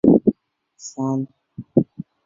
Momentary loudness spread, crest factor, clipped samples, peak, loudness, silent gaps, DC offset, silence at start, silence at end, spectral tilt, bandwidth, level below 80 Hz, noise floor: 21 LU; 20 dB; under 0.1%; -2 dBFS; -22 LUFS; none; under 0.1%; 0.05 s; 0.4 s; -9 dB/octave; 7.6 kHz; -54 dBFS; -58 dBFS